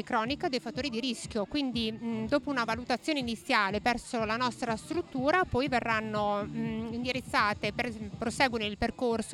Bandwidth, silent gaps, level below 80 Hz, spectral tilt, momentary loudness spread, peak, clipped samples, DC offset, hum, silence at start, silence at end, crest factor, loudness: 13 kHz; none; -54 dBFS; -4.5 dB/octave; 7 LU; -12 dBFS; under 0.1%; under 0.1%; none; 0 s; 0 s; 20 dB; -31 LUFS